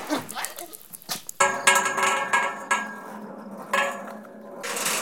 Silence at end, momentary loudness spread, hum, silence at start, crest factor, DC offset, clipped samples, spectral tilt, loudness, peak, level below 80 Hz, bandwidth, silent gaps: 0 s; 20 LU; none; 0 s; 24 dB; under 0.1%; under 0.1%; -1 dB/octave; -24 LUFS; -2 dBFS; -76 dBFS; 17 kHz; none